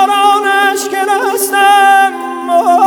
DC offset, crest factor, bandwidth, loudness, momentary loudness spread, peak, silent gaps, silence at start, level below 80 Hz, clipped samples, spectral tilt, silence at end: under 0.1%; 10 dB; 19.5 kHz; -10 LUFS; 7 LU; 0 dBFS; none; 0 s; -64 dBFS; under 0.1%; 0 dB/octave; 0 s